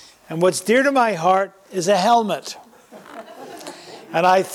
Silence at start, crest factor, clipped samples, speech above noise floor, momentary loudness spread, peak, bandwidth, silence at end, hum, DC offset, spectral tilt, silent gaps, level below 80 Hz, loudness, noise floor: 0.3 s; 14 dB; under 0.1%; 26 dB; 22 LU; -6 dBFS; 16.5 kHz; 0 s; none; under 0.1%; -4 dB/octave; none; -66 dBFS; -18 LUFS; -44 dBFS